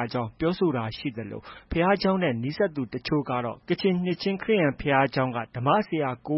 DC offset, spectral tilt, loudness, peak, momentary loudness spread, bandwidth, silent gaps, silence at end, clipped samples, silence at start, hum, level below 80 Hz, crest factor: under 0.1%; -10 dB/octave; -26 LUFS; -8 dBFS; 9 LU; 5.8 kHz; none; 0 s; under 0.1%; 0 s; none; -50 dBFS; 18 dB